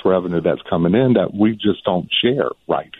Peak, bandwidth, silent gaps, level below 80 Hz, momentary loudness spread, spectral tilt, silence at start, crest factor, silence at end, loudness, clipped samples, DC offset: -4 dBFS; 4.1 kHz; none; -50 dBFS; 6 LU; -9 dB/octave; 0.05 s; 14 dB; 0.15 s; -18 LUFS; under 0.1%; under 0.1%